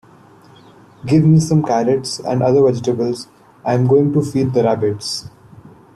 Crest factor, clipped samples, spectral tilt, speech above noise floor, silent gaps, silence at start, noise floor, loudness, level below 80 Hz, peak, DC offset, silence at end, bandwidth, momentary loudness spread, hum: 14 dB; under 0.1%; -7 dB/octave; 30 dB; none; 1.05 s; -45 dBFS; -16 LUFS; -50 dBFS; -2 dBFS; under 0.1%; 0.3 s; 12 kHz; 13 LU; none